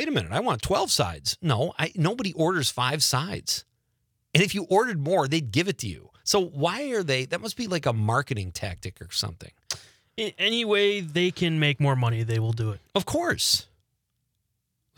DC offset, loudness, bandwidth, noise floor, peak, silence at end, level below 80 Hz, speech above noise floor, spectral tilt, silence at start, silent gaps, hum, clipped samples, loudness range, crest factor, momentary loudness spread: under 0.1%; -25 LUFS; 19.5 kHz; -77 dBFS; 0 dBFS; 1.35 s; -56 dBFS; 52 dB; -4 dB/octave; 0 s; none; none; under 0.1%; 3 LU; 26 dB; 10 LU